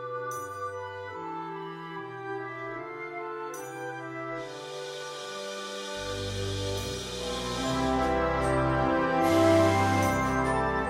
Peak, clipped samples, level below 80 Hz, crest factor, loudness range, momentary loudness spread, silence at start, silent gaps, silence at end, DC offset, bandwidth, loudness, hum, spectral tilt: -12 dBFS; under 0.1%; -46 dBFS; 18 dB; 12 LU; 14 LU; 0 s; none; 0 s; under 0.1%; 16 kHz; -30 LUFS; none; -5 dB/octave